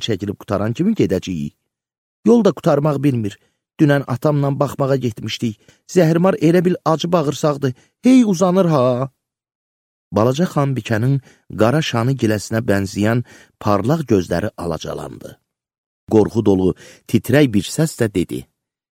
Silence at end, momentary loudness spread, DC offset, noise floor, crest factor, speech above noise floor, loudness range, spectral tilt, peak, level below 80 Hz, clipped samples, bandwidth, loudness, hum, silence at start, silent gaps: 0.5 s; 11 LU; under 0.1%; under -90 dBFS; 18 dB; over 73 dB; 4 LU; -6.5 dB/octave; 0 dBFS; -50 dBFS; under 0.1%; 16.5 kHz; -17 LUFS; none; 0 s; 1.98-2.23 s, 9.55-10.11 s, 15.78-16.07 s